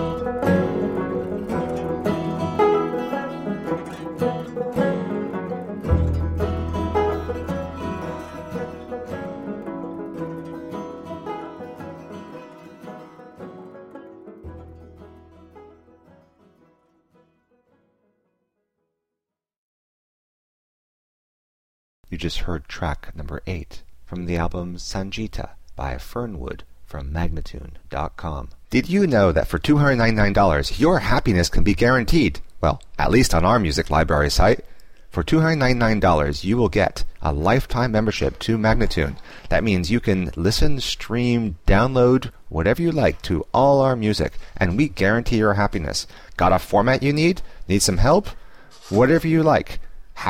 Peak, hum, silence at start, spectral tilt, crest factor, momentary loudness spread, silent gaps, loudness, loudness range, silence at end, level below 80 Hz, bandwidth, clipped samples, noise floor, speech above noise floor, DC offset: -6 dBFS; none; 0 s; -6 dB/octave; 16 dB; 18 LU; 19.56-22.04 s; -21 LUFS; 15 LU; 0 s; -32 dBFS; 16 kHz; under 0.1%; -86 dBFS; 66 dB; under 0.1%